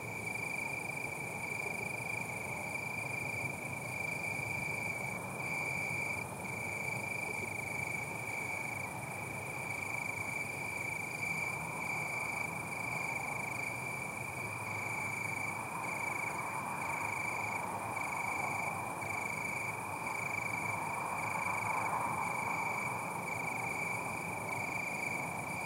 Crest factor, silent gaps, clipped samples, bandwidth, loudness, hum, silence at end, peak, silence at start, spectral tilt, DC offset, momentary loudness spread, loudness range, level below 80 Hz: 16 dB; none; under 0.1%; 16 kHz; -37 LUFS; none; 0 s; -24 dBFS; 0 s; -4 dB/octave; under 0.1%; 4 LU; 2 LU; -68 dBFS